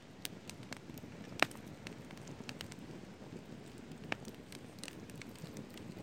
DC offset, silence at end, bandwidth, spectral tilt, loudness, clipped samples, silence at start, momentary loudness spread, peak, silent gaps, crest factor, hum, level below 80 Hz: under 0.1%; 0 s; 16.5 kHz; -4 dB/octave; -45 LUFS; under 0.1%; 0 s; 15 LU; -6 dBFS; none; 40 dB; none; -68 dBFS